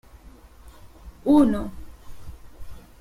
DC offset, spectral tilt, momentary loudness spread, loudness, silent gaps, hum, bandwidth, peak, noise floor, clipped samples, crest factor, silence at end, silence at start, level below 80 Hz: under 0.1%; -7.5 dB/octave; 28 LU; -21 LUFS; none; none; 13.5 kHz; -8 dBFS; -47 dBFS; under 0.1%; 18 dB; 0.2 s; 0.15 s; -44 dBFS